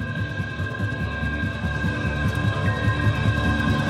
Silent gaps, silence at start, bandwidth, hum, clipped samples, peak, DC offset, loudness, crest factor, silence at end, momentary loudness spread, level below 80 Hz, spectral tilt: none; 0 s; 12 kHz; none; under 0.1%; -10 dBFS; under 0.1%; -24 LUFS; 14 dB; 0 s; 6 LU; -34 dBFS; -6.5 dB/octave